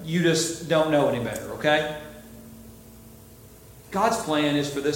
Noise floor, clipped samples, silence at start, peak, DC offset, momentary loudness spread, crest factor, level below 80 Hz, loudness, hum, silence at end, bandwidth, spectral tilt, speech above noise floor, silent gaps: -48 dBFS; under 0.1%; 0 s; -6 dBFS; under 0.1%; 23 LU; 18 dB; -54 dBFS; -24 LUFS; none; 0 s; 17 kHz; -4.5 dB/octave; 24 dB; none